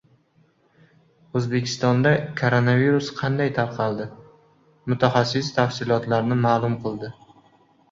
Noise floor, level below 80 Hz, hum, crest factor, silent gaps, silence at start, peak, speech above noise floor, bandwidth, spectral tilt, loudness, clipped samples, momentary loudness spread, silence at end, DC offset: -61 dBFS; -58 dBFS; none; 20 dB; none; 1.35 s; -4 dBFS; 40 dB; 7.6 kHz; -6.5 dB/octave; -22 LUFS; under 0.1%; 11 LU; 0.8 s; under 0.1%